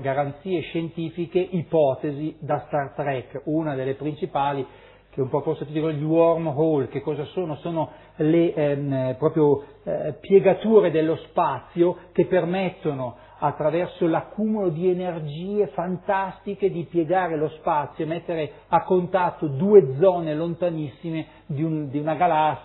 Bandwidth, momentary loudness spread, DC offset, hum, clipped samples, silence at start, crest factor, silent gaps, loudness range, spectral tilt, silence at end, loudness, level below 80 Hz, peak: 4.1 kHz; 10 LU; under 0.1%; none; under 0.1%; 0 s; 20 dB; none; 5 LU; -11.5 dB/octave; 0 s; -23 LUFS; -58 dBFS; -2 dBFS